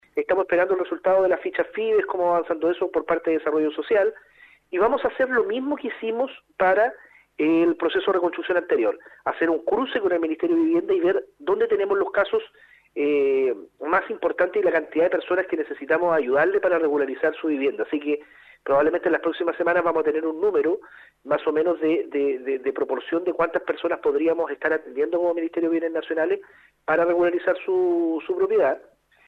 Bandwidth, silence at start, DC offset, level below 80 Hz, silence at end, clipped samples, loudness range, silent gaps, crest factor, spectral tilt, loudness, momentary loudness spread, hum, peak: 4.9 kHz; 0.15 s; under 0.1%; -62 dBFS; 0.5 s; under 0.1%; 2 LU; none; 16 dB; -7 dB/octave; -23 LUFS; 6 LU; none; -6 dBFS